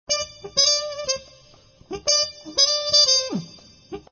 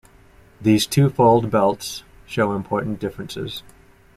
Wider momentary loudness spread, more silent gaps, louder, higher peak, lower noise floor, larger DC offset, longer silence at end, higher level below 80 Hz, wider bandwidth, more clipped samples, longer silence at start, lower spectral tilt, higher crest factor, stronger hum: about the same, 16 LU vs 15 LU; neither; about the same, -19 LUFS vs -20 LUFS; second, -6 dBFS vs -2 dBFS; about the same, -52 dBFS vs -50 dBFS; neither; second, 0.1 s vs 0.55 s; second, -56 dBFS vs -50 dBFS; second, 7 kHz vs 16 kHz; neither; second, 0.1 s vs 0.6 s; second, -0.5 dB/octave vs -6 dB/octave; about the same, 18 dB vs 18 dB; neither